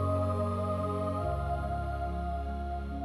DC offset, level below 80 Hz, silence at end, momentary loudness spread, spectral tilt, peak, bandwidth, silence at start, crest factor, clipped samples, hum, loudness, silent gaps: under 0.1%; -38 dBFS; 0 s; 6 LU; -8.5 dB/octave; -20 dBFS; 12 kHz; 0 s; 12 dB; under 0.1%; none; -33 LUFS; none